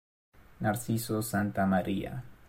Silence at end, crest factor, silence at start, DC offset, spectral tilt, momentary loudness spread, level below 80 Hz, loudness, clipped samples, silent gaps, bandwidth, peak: 0 s; 16 dB; 0.35 s; under 0.1%; -6 dB/octave; 6 LU; -58 dBFS; -31 LUFS; under 0.1%; none; 16.5 kHz; -16 dBFS